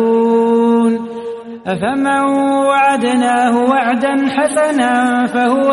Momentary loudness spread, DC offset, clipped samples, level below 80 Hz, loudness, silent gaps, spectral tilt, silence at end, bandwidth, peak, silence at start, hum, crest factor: 8 LU; under 0.1%; under 0.1%; -58 dBFS; -13 LUFS; none; -5 dB/octave; 0 s; 11.5 kHz; -2 dBFS; 0 s; none; 12 dB